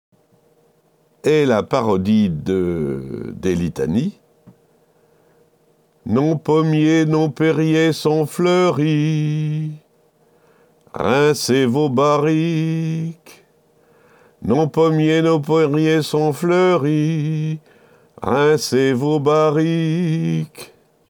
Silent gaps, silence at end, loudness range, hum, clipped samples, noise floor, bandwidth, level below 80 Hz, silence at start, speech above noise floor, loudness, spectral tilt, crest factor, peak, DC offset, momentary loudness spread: none; 0.45 s; 5 LU; none; under 0.1%; -58 dBFS; 19 kHz; -52 dBFS; 1.25 s; 42 dB; -17 LUFS; -6.5 dB/octave; 14 dB; -4 dBFS; under 0.1%; 9 LU